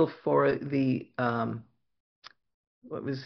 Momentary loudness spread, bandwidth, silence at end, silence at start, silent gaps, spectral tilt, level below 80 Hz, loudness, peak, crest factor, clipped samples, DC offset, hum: 13 LU; 6.2 kHz; 0 s; 0 s; 2.00-2.22 s, 2.54-2.82 s; -6.5 dB/octave; -68 dBFS; -29 LUFS; -12 dBFS; 18 dB; under 0.1%; under 0.1%; none